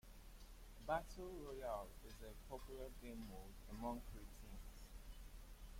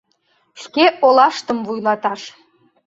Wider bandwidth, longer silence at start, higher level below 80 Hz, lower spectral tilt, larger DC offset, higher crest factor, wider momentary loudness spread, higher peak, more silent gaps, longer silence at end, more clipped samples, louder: first, 16.5 kHz vs 7.8 kHz; second, 0.05 s vs 0.55 s; first, -58 dBFS vs -64 dBFS; about the same, -5 dB/octave vs -4 dB/octave; neither; first, 22 dB vs 16 dB; second, 16 LU vs 19 LU; second, -30 dBFS vs -2 dBFS; neither; second, 0 s vs 0.6 s; neither; second, -53 LUFS vs -16 LUFS